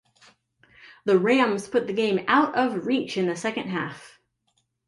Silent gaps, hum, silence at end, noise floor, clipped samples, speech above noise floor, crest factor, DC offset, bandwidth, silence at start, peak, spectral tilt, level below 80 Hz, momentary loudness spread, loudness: none; none; 0.8 s; -72 dBFS; under 0.1%; 49 dB; 18 dB; under 0.1%; 11.5 kHz; 0.85 s; -8 dBFS; -5.5 dB/octave; -70 dBFS; 10 LU; -24 LUFS